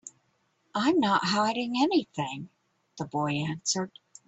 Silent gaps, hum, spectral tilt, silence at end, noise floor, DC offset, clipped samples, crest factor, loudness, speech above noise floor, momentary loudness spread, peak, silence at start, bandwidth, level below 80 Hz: none; none; -4 dB/octave; 0.4 s; -72 dBFS; under 0.1%; under 0.1%; 18 dB; -28 LUFS; 44 dB; 15 LU; -12 dBFS; 0.05 s; 8.4 kHz; -70 dBFS